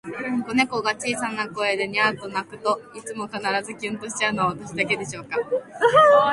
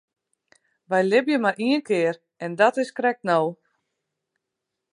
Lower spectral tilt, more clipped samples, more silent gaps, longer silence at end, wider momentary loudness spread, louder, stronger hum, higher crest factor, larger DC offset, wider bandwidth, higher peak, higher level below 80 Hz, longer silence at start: second, -3.5 dB/octave vs -5.5 dB/octave; neither; neither; second, 0 s vs 1.4 s; first, 11 LU vs 7 LU; about the same, -23 LUFS vs -22 LUFS; neither; about the same, 20 dB vs 20 dB; neither; about the same, 11.5 kHz vs 11 kHz; about the same, -4 dBFS vs -6 dBFS; first, -62 dBFS vs -80 dBFS; second, 0.05 s vs 0.9 s